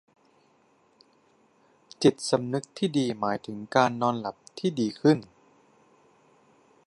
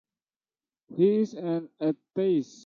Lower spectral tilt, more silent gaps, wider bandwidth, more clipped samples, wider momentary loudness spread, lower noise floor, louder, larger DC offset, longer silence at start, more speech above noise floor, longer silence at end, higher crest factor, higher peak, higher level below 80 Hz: second, -5.5 dB/octave vs -8 dB/octave; neither; first, 11.5 kHz vs 7.4 kHz; neither; about the same, 9 LU vs 8 LU; second, -64 dBFS vs under -90 dBFS; about the same, -27 LUFS vs -27 LUFS; neither; first, 2 s vs 0.9 s; second, 38 dB vs over 63 dB; first, 1.6 s vs 0.2 s; first, 24 dB vs 18 dB; first, -6 dBFS vs -12 dBFS; first, -72 dBFS vs -78 dBFS